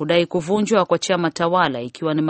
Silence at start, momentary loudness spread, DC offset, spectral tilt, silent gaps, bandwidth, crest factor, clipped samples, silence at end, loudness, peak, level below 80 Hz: 0 s; 4 LU; under 0.1%; -5 dB/octave; none; 8.8 kHz; 16 dB; under 0.1%; 0 s; -19 LUFS; -2 dBFS; -58 dBFS